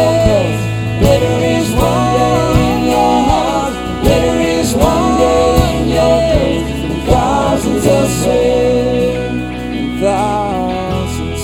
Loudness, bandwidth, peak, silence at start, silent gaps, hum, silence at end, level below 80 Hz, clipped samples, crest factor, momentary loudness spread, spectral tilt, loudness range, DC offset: -13 LUFS; 20 kHz; 0 dBFS; 0 s; none; none; 0 s; -24 dBFS; under 0.1%; 12 dB; 7 LU; -6 dB/octave; 2 LU; under 0.1%